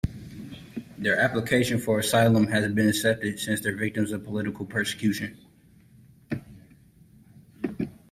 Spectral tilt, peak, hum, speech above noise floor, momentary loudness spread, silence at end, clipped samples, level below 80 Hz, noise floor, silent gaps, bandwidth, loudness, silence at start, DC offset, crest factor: -5 dB/octave; -8 dBFS; none; 31 dB; 16 LU; 0.15 s; under 0.1%; -52 dBFS; -56 dBFS; none; 16 kHz; -26 LUFS; 0.05 s; under 0.1%; 18 dB